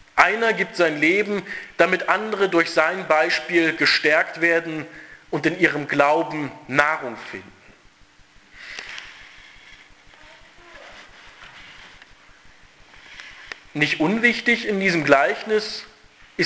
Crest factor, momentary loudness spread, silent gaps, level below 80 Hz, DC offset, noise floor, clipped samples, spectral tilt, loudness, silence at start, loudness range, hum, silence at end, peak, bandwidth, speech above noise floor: 22 dB; 22 LU; none; -60 dBFS; under 0.1%; -52 dBFS; under 0.1%; -4.5 dB/octave; -20 LUFS; 0.15 s; 21 LU; none; 0 s; 0 dBFS; 8 kHz; 32 dB